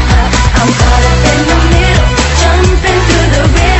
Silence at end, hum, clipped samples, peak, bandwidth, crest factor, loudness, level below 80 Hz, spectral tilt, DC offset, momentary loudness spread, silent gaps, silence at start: 0 s; none; 0.7%; 0 dBFS; 8.4 kHz; 8 dB; -8 LUFS; -10 dBFS; -4.5 dB/octave; under 0.1%; 1 LU; none; 0 s